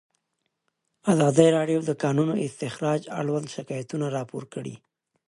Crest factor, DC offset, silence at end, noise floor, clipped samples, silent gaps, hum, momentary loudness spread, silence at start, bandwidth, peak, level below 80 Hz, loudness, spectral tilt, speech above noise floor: 22 dB; under 0.1%; 0.5 s; -78 dBFS; under 0.1%; none; none; 16 LU; 1.05 s; 11.5 kHz; -4 dBFS; -68 dBFS; -25 LUFS; -6.5 dB/octave; 54 dB